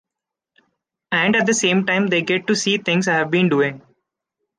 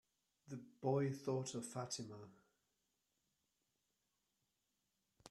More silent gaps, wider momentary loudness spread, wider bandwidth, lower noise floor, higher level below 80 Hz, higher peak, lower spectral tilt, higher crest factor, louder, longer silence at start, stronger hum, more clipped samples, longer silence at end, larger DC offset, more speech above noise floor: neither; second, 3 LU vs 16 LU; second, 10 kHz vs 13 kHz; about the same, -85 dBFS vs -88 dBFS; first, -66 dBFS vs -86 dBFS; first, -4 dBFS vs -26 dBFS; second, -4 dB/octave vs -5.5 dB/octave; second, 16 dB vs 22 dB; first, -18 LUFS vs -43 LUFS; first, 1.1 s vs 0.45 s; neither; neither; first, 0.8 s vs 0 s; neither; first, 67 dB vs 45 dB